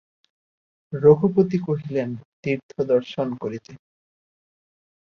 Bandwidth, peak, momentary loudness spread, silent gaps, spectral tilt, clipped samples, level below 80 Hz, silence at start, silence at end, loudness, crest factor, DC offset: 6.6 kHz; -2 dBFS; 15 LU; 2.25-2.43 s, 2.63-2.69 s; -9 dB/octave; under 0.1%; -62 dBFS; 0.9 s; 1.3 s; -22 LUFS; 20 dB; under 0.1%